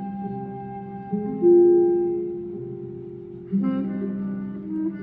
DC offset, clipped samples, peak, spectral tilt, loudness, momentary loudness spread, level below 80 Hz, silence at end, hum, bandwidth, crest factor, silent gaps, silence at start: under 0.1%; under 0.1%; -8 dBFS; -13 dB/octave; -23 LUFS; 19 LU; -60 dBFS; 0 s; none; 3.1 kHz; 16 dB; none; 0 s